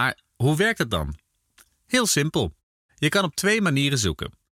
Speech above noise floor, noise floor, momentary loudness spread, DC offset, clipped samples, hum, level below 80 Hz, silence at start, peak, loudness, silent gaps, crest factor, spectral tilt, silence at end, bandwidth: 37 dB; -60 dBFS; 9 LU; under 0.1%; under 0.1%; none; -46 dBFS; 0 s; -10 dBFS; -23 LUFS; 2.63-2.89 s; 16 dB; -4 dB/octave; 0.25 s; 16.5 kHz